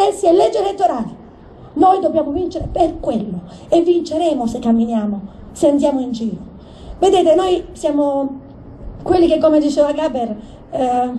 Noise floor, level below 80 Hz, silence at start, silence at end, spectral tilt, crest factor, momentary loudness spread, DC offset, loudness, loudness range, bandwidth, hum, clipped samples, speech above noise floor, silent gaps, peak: -39 dBFS; -40 dBFS; 0 s; 0 s; -6 dB/octave; 16 dB; 16 LU; under 0.1%; -16 LUFS; 2 LU; 11.5 kHz; none; under 0.1%; 24 dB; none; 0 dBFS